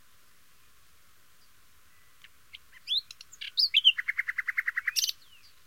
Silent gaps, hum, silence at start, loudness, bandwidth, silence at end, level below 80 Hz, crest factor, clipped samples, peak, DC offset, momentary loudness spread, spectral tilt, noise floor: none; none; 2.55 s; -26 LUFS; 16.5 kHz; 0.55 s; -74 dBFS; 24 dB; under 0.1%; -10 dBFS; 0.2%; 16 LU; 4.5 dB/octave; -63 dBFS